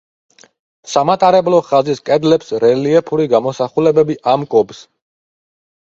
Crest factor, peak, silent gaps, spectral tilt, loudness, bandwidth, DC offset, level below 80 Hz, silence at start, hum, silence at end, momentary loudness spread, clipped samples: 14 dB; 0 dBFS; none; -6 dB/octave; -14 LUFS; 7.8 kHz; under 0.1%; -56 dBFS; 0.85 s; none; 1.05 s; 5 LU; under 0.1%